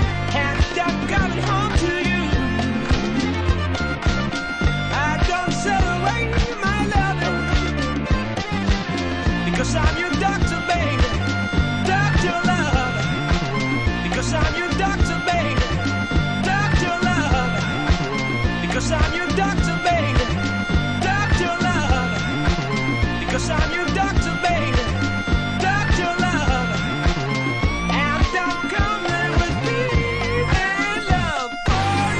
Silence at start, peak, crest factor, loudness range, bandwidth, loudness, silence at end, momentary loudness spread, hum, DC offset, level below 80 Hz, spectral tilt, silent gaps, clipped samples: 0 s; -4 dBFS; 16 dB; 1 LU; 10 kHz; -20 LUFS; 0 s; 3 LU; none; under 0.1%; -26 dBFS; -5.5 dB/octave; none; under 0.1%